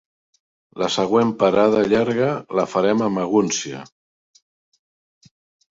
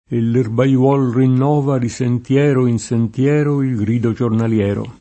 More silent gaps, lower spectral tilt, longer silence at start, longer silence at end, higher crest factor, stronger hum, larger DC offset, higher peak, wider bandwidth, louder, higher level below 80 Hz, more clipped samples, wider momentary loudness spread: neither; second, -5 dB/octave vs -8 dB/octave; first, 0.75 s vs 0.1 s; first, 1.9 s vs 0.1 s; about the same, 18 dB vs 14 dB; neither; neither; about the same, -2 dBFS vs 0 dBFS; second, 7.8 kHz vs 8.6 kHz; second, -19 LUFS vs -16 LUFS; second, -58 dBFS vs -50 dBFS; neither; first, 8 LU vs 5 LU